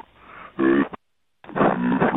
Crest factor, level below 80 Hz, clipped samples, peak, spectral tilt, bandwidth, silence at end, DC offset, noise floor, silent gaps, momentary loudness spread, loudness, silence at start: 18 dB; -54 dBFS; under 0.1%; -4 dBFS; -10.5 dB/octave; 4 kHz; 0 s; under 0.1%; -56 dBFS; none; 21 LU; -22 LUFS; 0.3 s